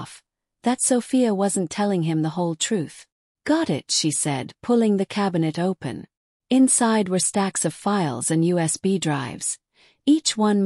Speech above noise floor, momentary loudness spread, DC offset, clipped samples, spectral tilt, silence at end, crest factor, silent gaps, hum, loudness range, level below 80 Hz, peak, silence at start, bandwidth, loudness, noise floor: 33 dB; 9 LU; under 0.1%; under 0.1%; -4.5 dB/octave; 0 s; 16 dB; 3.12-3.35 s, 6.17-6.40 s; none; 2 LU; -66 dBFS; -8 dBFS; 0 s; 13.5 kHz; -22 LUFS; -54 dBFS